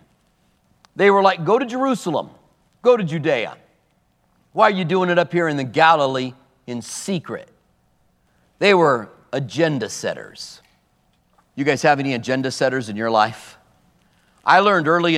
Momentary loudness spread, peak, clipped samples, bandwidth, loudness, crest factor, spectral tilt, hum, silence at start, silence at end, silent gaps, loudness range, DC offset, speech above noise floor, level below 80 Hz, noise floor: 17 LU; 0 dBFS; under 0.1%; 14 kHz; -19 LUFS; 20 dB; -5 dB/octave; none; 0.95 s; 0 s; none; 3 LU; under 0.1%; 45 dB; -68 dBFS; -63 dBFS